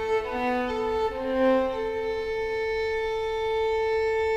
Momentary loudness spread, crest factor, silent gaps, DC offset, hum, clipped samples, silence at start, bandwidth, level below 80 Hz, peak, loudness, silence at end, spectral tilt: 6 LU; 14 dB; none; under 0.1%; none; under 0.1%; 0 s; 9.4 kHz; -46 dBFS; -12 dBFS; -27 LUFS; 0 s; -5 dB/octave